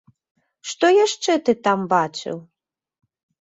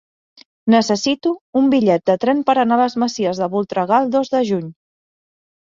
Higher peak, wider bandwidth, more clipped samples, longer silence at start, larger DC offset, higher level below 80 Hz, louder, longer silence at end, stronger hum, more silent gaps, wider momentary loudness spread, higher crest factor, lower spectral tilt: about the same, -4 dBFS vs -2 dBFS; first, 8.4 kHz vs 7.6 kHz; neither; about the same, 0.65 s vs 0.65 s; neither; second, -70 dBFS vs -62 dBFS; about the same, -19 LUFS vs -17 LUFS; about the same, 1 s vs 1.05 s; neither; second, none vs 1.41-1.53 s; first, 17 LU vs 6 LU; about the same, 18 dB vs 16 dB; second, -4 dB/octave vs -5.5 dB/octave